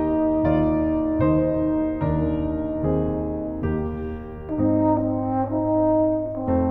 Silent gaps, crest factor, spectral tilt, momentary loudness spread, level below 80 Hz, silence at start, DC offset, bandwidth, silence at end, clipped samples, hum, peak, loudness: none; 14 dB; -12.5 dB/octave; 7 LU; -36 dBFS; 0 s; under 0.1%; 3.8 kHz; 0 s; under 0.1%; none; -8 dBFS; -23 LUFS